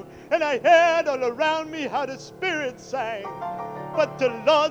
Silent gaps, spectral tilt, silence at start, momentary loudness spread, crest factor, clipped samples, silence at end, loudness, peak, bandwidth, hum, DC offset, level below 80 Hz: none; -4 dB/octave; 0 s; 15 LU; 18 dB; under 0.1%; 0 s; -23 LUFS; -4 dBFS; 8.6 kHz; none; under 0.1%; -64 dBFS